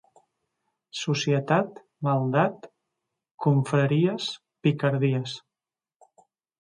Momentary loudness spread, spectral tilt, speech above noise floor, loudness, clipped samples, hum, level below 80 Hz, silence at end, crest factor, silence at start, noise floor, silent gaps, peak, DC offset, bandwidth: 12 LU; -6.5 dB/octave; over 66 dB; -25 LUFS; under 0.1%; none; -70 dBFS; 1.25 s; 18 dB; 0.95 s; under -90 dBFS; 3.31-3.38 s; -10 dBFS; under 0.1%; 10.5 kHz